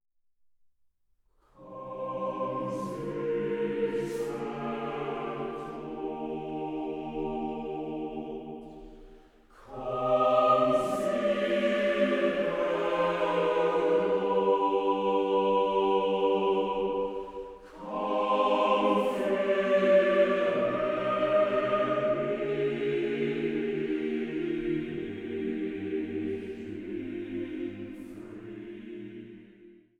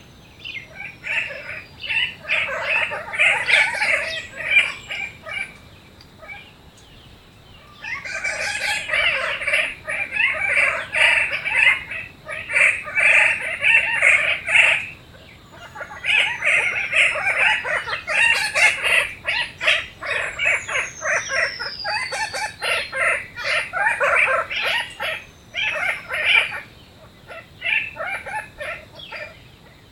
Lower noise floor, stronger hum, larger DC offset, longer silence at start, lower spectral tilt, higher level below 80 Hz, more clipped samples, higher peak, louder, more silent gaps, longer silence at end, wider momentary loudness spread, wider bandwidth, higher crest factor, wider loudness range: first, -69 dBFS vs -46 dBFS; neither; neither; first, 1.6 s vs 0 s; first, -6.5 dB/octave vs -0.5 dB/octave; second, -58 dBFS vs -52 dBFS; neither; second, -12 dBFS vs -2 dBFS; second, -29 LUFS vs -18 LUFS; neither; second, 0.3 s vs 0.45 s; about the same, 16 LU vs 17 LU; second, 12.5 kHz vs 17.5 kHz; about the same, 18 dB vs 20 dB; about the same, 10 LU vs 8 LU